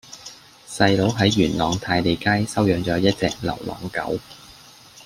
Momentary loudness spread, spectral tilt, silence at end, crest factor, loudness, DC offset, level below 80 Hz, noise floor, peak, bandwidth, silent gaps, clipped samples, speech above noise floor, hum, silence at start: 19 LU; -5.5 dB/octave; 0.6 s; 20 dB; -21 LUFS; under 0.1%; -48 dBFS; -46 dBFS; -2 dBFS; 16 kHz; none; under 0.1%; 26 dB; none; 0.1 s